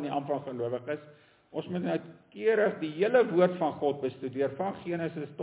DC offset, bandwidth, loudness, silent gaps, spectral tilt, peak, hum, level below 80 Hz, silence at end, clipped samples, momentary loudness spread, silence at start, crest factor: under 0.1%; 4 kHz; -30 LUFS; none; -10.5 dB/octave; -12 dBFS; none; -72 dBFS; 0 s; under 0.1%; 11 LU; 0 s; 18 dB